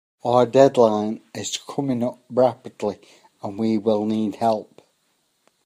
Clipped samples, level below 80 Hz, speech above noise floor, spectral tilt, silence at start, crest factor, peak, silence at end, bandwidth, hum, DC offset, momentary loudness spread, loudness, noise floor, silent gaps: under 0.1%; -68 dBFS; 47 dB; -6 dB/octave; 0.25 s; 22 dB; 0 dBFS; 1.05 s; 15.5 kHz; none; under 0.1%; 14 LU; -21 LUFS; -68 dBFS; none